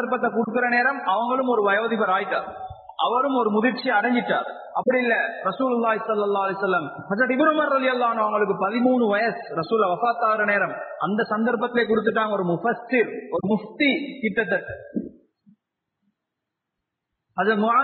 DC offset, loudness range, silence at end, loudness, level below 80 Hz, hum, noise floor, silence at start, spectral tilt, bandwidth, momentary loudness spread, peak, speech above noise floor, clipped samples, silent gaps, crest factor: under 0.1%; 5 LU; 0 s; -22 LUFS; -64 dBFS; none; -83 dBFS; 0 s; -10 dB/octave; 4.6 kHz; 7 LU; -6 dBFS; 61 dB; under 0.1%; none; 16 dB